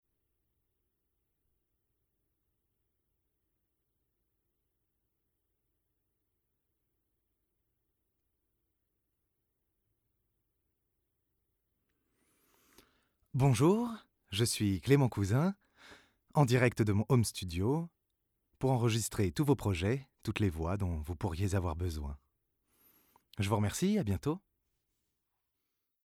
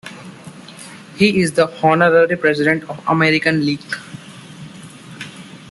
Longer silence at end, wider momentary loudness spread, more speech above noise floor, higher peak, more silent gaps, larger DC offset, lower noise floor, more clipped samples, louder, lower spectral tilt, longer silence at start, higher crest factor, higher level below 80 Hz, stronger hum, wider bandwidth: first, 1.7 s vs 0 s; second, 12 LU vs 23 LU; first, 52 dB vs 22 dB; second, -14 dBFS vs -2 dBFS; neither; neither; first, -83 dBFS vs -37 dBFS; neither; second, -32 LUFS vs -15 LUFS; about the same, -6 dB/octave vs -5.5 dB/octave; first, 13.35 s vs 0.05 s; first, 22 dB vs 16 dB; about the same, -58 dBFS vs -56 dBFS; neither; first, 16.5 kHz vs 12 kHz